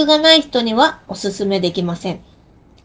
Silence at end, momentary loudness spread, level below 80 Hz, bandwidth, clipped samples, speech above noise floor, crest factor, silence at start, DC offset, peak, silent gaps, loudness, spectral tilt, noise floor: 0.65 s; 15 LU; -50 dBFS; 9.8 kHz; under 0.1%; 32 dB; 16 dB; 0 s; under 0.1%; 0 dBFS; none; -15 LUFS; -4.5 dB/octave; -48 dBFS